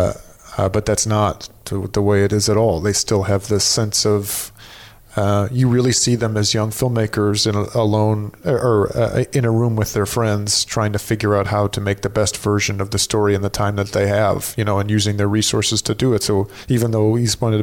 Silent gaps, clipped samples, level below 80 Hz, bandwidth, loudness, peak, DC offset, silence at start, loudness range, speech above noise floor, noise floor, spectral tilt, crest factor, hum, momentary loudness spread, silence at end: none; under 0.1%; -42 dBFS; 17.5 kHz; -18 LUFS; -6 dBFS; under 0.1%; 0 s; 1 LU; 24 dB; -41 dBFS; -4.5 dB/octave; 12 dB; none; 5 LU; 0 s